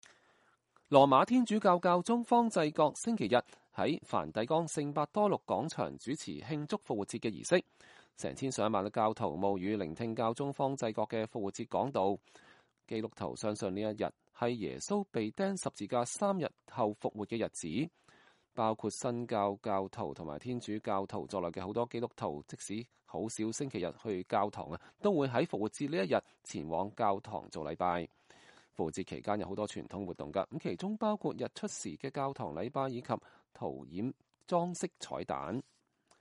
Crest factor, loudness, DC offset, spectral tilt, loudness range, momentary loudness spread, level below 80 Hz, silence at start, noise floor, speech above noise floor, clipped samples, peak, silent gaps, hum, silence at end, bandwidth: 26 dB; -35 LUFS; under 0.1%; -5.5 dB/octave; 7 LU; 11 LU; -70 dBFS; 0.9 s; -71 dBFS; 36 dB; under 0.1%; -8 dBFS; none; none; 0.6 s; 11.5 kHz